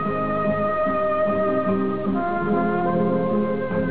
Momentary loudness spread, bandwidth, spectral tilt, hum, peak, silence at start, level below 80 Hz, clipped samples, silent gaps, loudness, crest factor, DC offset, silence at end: 2 LU; 4 kHz; -11.5 dB/octave; none; -10 dBFS; 0 s; -48 dBFS; under 0.1%; none; -22 LUFS; 12 dB; 1%; 0 s